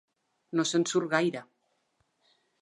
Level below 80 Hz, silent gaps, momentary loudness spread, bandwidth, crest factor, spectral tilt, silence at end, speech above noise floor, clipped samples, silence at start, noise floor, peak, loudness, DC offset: -84 dBFS; none; 7 LU; 11 kHz; 22 dB; -4 dB/octave; 1.2 s; 47 dB; under 0.1%; 0.55 s; -75 dBFS; -10 dBFS; -28 LUFS; under 0.1%